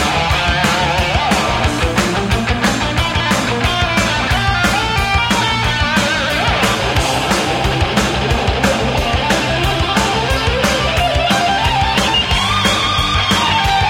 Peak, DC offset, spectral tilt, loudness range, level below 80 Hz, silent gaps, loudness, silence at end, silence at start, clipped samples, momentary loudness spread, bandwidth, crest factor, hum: 0 dBFS; under 0.1%; -4 dB/octave; 1 LU; -24 dBFS; none; -14 LUFS; 0 s; 0 s; under 0.1%; 3 LU; 16.5 kHz; 14 dB; none